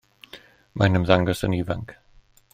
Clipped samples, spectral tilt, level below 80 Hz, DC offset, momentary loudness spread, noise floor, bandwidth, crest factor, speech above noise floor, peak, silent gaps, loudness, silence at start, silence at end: under 0.1%; -6.5 dB/octave; -48 dBFS; under 0.1%; 25 LU; -55 dBFS; 15.5 kHz; 22 dB; 34 dB; -2 dBFS; none; -22 LUFS; 0.35 s; 0.6 s